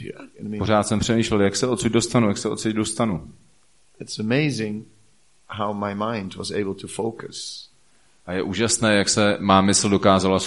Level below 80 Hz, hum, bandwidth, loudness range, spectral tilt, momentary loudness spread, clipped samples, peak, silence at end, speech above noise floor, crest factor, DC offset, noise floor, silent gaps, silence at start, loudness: -50 dBFS; none; 11.5 kHz; 8 LU; -4.5 dB/octave; 15 LU; under 0.1%; -2 dBFS; 0 s; 40 dB; 20 dB; 0.2%; -61 dBFS; none; 0 s; -21 LUFS